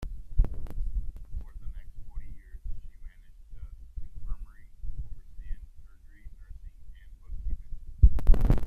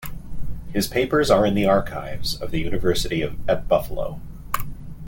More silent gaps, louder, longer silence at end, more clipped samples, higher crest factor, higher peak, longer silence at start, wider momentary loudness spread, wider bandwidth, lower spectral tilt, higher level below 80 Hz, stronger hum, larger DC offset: neither; second, -33 LUFS vs -23 LUFS; about the same, 0 s vs 0 s; neither; about the same, 22 dB vs 18 dB; about the same, -6 dBFS vs -4 dBFS; about the same, 0 s vs 0 s; first, 27 LU vs 19 LU; second, 3.1 kHz vs 17 kHz; first, -9 dB/octave vs -5 dB/octave; about the same, -30 dBFS vs -34 dBFS; neither; neither